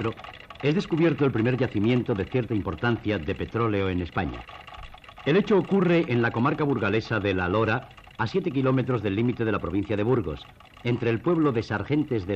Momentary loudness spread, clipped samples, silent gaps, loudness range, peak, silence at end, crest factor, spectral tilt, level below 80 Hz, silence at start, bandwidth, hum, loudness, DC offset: 11 LU; under 0.1%; none; 3 LU; -12 dBFS; 0 s; 14 dB; -8 dB/octave; -50 dBFS; 0 s; 8 kHz; none; -25 LUFS; under 0.1%